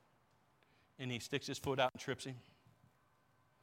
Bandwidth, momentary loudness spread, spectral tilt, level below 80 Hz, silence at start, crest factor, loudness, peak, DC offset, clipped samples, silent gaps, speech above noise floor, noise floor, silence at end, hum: 16.5 kHz; 12 LU; -4.5 dB/octave; -76 dBFS; 1 s; 24 dB; -41 LUFS; -20 dBFS; under 0.1%; under 0.1%; none; 33 dB; -74 dBFS; 1.2 s; none